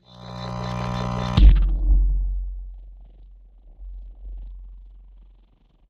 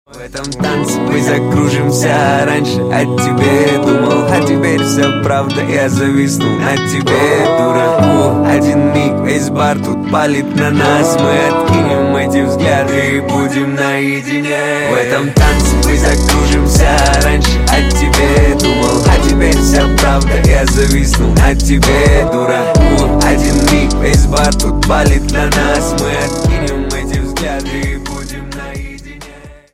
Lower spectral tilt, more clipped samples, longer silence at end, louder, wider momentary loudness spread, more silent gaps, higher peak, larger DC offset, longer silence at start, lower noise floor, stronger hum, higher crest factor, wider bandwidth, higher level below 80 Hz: first, -7.5 dB/octave vs -5 dB/octave; neither; first, 1.05 s vs 0.2 s; second, -23 LUFS vs -11 LUFS; first, 26 LU vs 7 LU; neither; about the same, -2 dBFS vs 0 dBFS; neither; about the same, 0.2 s vs 0.15 s; first, -56 dBFS vs -34 dBFS; neither; first, 22 dB vs 10 dB; second, 6.4 kHz vs 16 kHz; second, -22 dBFS vs -16 dBFS